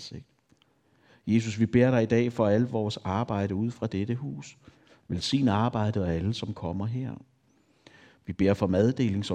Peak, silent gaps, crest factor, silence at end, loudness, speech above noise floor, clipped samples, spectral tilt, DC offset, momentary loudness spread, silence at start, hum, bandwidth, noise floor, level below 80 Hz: -8 dBFS; none; 20 dB; 0 s; -27 LUFS; 39 dB; under 0.1%; -7 dB/octave; under 0.1%; 16 LU; 0 s; none; 9.6 kHz; -66 dBFS; -58 dBFS